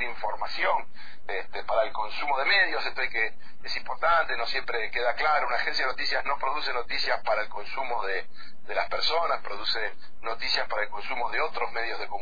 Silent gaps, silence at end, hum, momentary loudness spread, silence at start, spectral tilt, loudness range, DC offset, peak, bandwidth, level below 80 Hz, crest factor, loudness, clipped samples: none; 0 s; none; 9 LU; 0 s; -3 dB/octave; 3 LU; 4%; -12 dBFS; 5 kHz; -56 dBFS; 16 dB; -28 LUFS; under 0.1%